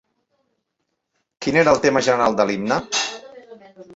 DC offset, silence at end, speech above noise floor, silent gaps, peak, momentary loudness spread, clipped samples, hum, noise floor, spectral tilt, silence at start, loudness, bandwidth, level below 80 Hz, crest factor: under 0.1%; 0 s; 58 dB; none; -2 dBFS; 11 LU; under 0.1%; none; -76 dBFS; -3.5 dB/octave; 1.4 s; -19 LUFS; 8 kHz; -56 dBFS; 20 dB